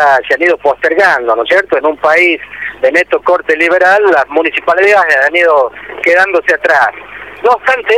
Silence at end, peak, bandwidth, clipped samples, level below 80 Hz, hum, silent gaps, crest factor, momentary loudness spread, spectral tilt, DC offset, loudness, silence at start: 0 s; 0 dBFS; 14 kHz; under 0.1%; -50 dBFS; none; none; 10 dB; 7 LU; -3 dB/octave; 0.1%; -9 LUFS; 0 s